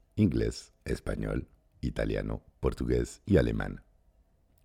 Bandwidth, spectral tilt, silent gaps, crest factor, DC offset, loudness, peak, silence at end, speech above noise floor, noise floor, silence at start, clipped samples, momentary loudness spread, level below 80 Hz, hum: 15 kHz; -7.5 dB/octave; none; 20 dB; under 0.1%; -32 LUFS; -12 dBFS; 0.85 s; 36 dB; -66 dBFS; 0.15 s; under 0.1%; 12 LU; -40 dBFS; none